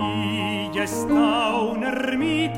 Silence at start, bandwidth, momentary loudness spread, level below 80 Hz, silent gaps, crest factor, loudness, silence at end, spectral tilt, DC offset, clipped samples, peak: 0 s; 16 kHz; 6 LU; -50 dBFS; none; 14 dB; -23 LUFS; 0 s; -5 dB/octave; under 0.1%; under 0.1%; -8 dBFS